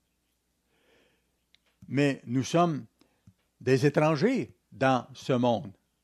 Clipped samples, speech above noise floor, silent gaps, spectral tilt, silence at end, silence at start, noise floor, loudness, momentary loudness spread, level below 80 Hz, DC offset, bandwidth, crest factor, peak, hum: under 0.1%; 50 dB; none; -6.5 dB/octave; 0.35 s; 1.9 s; -76 dBFS; -27 LUFS; 10 LU; -70 dBFS; under 0.1%; 13 kHz; 20 dB; -10 dBFS; none